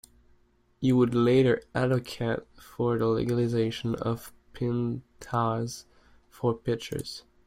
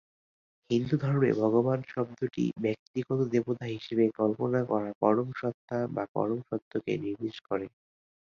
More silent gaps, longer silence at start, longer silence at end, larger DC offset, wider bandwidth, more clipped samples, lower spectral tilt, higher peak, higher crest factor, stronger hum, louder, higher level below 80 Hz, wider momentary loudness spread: second, none vs 2.79-2.94 s, 4.95-5.01 s, 5.54-5.68 s, 6.09-6.15 s, 6.62-6.71 s; about the same, 0.8 s vs 0.7 s; second, 0.25 s vs 0.6 s; neither; first, 16 kHz vs 7.2 kHz; neither; second, -7 dB/octave vs -8.5 dB/octave; about the same, -12 dBFS vs -10 dBFS; about the same, 16 dB vs 20 dB; neither; about the same, -28 LUFS vs -30 LUFS; first, -56 dBFS vs -68 dBFS; first, 14 LU vs 9 LU